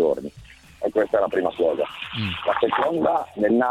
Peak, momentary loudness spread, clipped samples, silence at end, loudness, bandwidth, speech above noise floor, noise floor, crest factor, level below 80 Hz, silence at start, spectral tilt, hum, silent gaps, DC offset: -6 dBFS; 7 LU; under 0.1%; 0 s; -23 LUFS; 13 kHz; 24 dB; -46 dBFS; 16 dB; -54 dBFS; 0 s; -6.5 dB/octave; none; none; under 0.1%